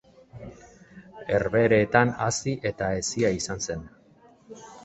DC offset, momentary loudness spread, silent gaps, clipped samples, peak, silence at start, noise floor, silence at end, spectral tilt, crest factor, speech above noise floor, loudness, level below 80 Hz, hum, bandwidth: under 0.1%; 24 LU; none; under 0.1%; -4 dBFS; 0.35 s; -56 dBFS; 0 s; -4.5 dB/octave; 24 dB; 32 dB; -25 LUFS; -52 dBFS; none; 8.4 kHz